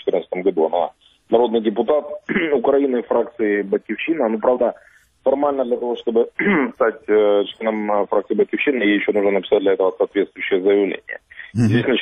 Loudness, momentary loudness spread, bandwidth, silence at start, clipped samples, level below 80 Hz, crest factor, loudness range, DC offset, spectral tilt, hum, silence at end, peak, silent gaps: -19 LUFS; 6 LU; 8.8 kHz; 0.05 s; under 0.1%; -58 dBFS; 18 dB; 2 LU; under 0.1%; -7.5 dB/octave; none; 0 s; -2 dBFS; none